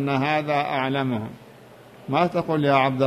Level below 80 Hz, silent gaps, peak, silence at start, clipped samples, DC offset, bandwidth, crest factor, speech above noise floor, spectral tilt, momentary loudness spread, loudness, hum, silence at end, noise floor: -62 dBFS; none; -6 dBFS; 0 s; under 0.1%; under 0.1%; 14.5 kHz; 16 dB; 25 dB; -7.5 dB/octave; 10 LU; -23 LUFS; none; 0 s; -47 dBFS